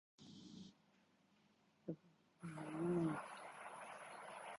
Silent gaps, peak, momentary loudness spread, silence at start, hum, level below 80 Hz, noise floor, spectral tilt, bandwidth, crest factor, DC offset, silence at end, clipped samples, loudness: none; -32 dBFS; 19 LU; 0.2 s; none; -82 dBFS; -76 dBFS; -6.5 dB/octave; 11 kHz; 18 dB; under 0.1%; 0 s; under 0.1%; -48 LUFS